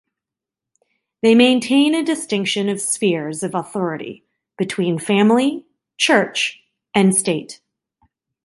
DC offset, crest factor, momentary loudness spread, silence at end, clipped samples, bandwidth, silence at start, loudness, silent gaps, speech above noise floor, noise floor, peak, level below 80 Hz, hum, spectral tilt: under 0.1%; 18 dB; 11 LU; 0.9 s; under 0.1%; 11.5 kHz; 1.25 s; -18 LUFS; none; 69 dB; -86 dBFS; -2 dBFS; -66 dBFS; none; -4 dB/octave